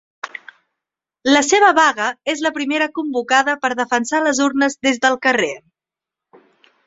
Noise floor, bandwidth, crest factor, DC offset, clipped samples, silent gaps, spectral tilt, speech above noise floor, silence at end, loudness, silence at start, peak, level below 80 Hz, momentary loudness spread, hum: -87 dBFS; 8 kHz; 18 dB; under 0.1%; under 0.1%; none; -1.5 dB/octave; 71 dB; 1.3 s; -16 LUFS; 0.25 s; -2 dBFS; -64 dBFS; 12 LU; none